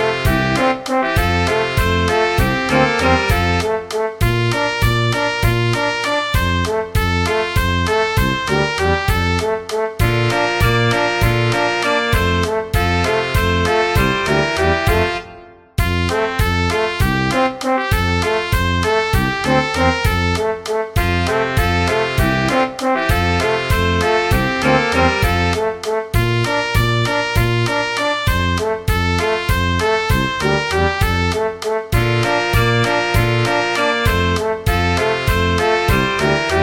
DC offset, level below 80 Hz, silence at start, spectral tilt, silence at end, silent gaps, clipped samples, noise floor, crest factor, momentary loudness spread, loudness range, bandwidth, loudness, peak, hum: under 0.1%; -26 dBFS; 0 s; -5 dB/octave; 0 s; none; under 0.1%; -39 dBFS; 16 dB; 4 LU; 1 LU; 17 kHz; -16 LUFS; 0 dBFS; none